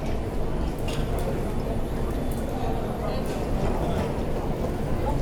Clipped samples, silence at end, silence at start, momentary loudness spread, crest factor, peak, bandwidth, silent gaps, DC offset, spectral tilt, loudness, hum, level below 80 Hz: under 0.1%; 0 s; 0 s; 3 LU; 12 dB; -12 dBFS; 18.5 kHz; none; under 0.1%; -7 dB/octave; -29 LUFS; none; -30 dBFS